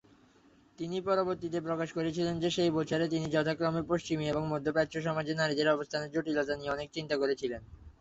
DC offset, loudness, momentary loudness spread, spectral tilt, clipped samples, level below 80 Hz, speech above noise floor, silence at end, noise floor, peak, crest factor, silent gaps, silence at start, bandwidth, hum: under 0.1%; -32 LUFS; 6 LU; -5.5 dB/octave; under 0.1%; -60 dBFS; 31 dB; 0.1 s; -63 dBFS; -14 dBFS; 18 dB; none; 0.8 s; 8 kHz; none